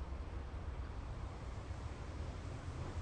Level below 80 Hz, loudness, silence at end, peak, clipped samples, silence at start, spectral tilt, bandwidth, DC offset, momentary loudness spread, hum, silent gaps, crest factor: -48 dBFS; -47 LUFS; 0 s; -34 dBFS; under 0.1%; 0 s; -6.5 dB/octave; 9.8 kHz; under 0.1%; 1 LU; none; none; 12 dB